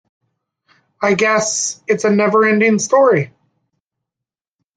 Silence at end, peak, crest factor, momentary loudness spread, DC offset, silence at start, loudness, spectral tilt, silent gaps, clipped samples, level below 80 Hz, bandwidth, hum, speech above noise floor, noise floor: 1.5 s; -2 dBFS; 16 dB; 7 LU; under 0.1%; 1 s; -14 LUFS; -4 dB/octave; none; under 0.1%; -64 dBFS; 10 kHz; none; 72 dB; -86 dBFS